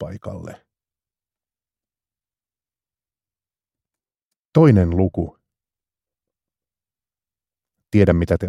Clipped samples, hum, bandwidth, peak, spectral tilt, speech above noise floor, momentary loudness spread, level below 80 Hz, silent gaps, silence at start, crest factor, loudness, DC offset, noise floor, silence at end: under 0.1%; none; 10.5 kHz; 0 dBFS; -9.5 dB/octave; over 73 dB; 19 LU; -42 dBFS; 4.23-4.31 s, 4.39-4.52 s; 0 s; 22 dB; -17 LUFS; under 0.1%; under -90 dBFS; 0 s